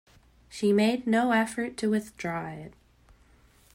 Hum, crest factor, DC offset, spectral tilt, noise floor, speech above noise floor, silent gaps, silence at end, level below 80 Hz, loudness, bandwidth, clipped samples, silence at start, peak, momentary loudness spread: none; 16 dB; under 0.1%; -5.5 dB/octave; -59 dBFS; 33 dB; none; 1.05 s; -62 dBFS; -27 LUFS; 16 kHz; under 0.1%; 0.5 s; -14 dBFS; 19 LU